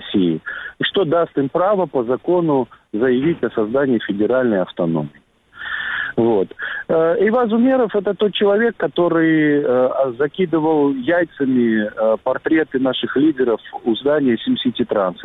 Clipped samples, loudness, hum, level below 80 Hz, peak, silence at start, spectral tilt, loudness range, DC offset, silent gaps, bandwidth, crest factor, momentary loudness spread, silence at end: under 0.1%; -18 LUFS; none; -56 dBFS; -6 dBFS; 0 s; -9 dB/octave; 3 LU; under 0.1%; none; 4 kHz; 12 dB; 6 LU; 0 s